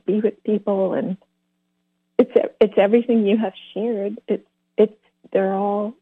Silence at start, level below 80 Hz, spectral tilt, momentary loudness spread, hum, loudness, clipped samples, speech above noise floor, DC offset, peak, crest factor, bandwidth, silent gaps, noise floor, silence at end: 0.1 s; -68 dBFS; -9.5 dB/octave; 10 LU; none; -21 LUFS; under 0.1%; 52 dB; under 0.1%; -4 dBFS; 18 dB; 4.2 kHz; none; -72 dBFS; 0.1 s